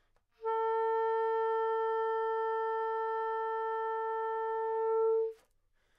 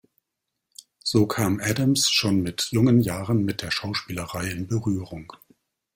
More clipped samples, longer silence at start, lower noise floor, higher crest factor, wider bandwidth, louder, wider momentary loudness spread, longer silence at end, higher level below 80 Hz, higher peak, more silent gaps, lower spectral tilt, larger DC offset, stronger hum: neither; second, 0.4 s vs 1.05 s; second, -72 dBFS vs -82 dBFS; second, 8 dB vs 18 dB; second, 5.2 kHz vs 17 kHz; second, -33 LUFS vs -23 LUFS; second, 4 LU vs 11 LU; about the same, 0.65 s vs 0.6 s; second, -76 dBFS vs -54 dBFS; second, -24 dBFS vs -6 dBFS; neither; second, -3 dB/octave vs -4.5 dB/octave; neither; neither